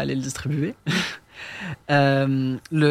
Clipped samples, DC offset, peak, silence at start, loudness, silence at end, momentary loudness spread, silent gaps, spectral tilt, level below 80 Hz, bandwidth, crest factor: under 0.1%; under 0.1%; -6 dBFS; 0 s; -23 LUFS; 0 s; 14 LU; none; -6 dB/octave; -54 dBFS; 14.5 kHz; 16 dB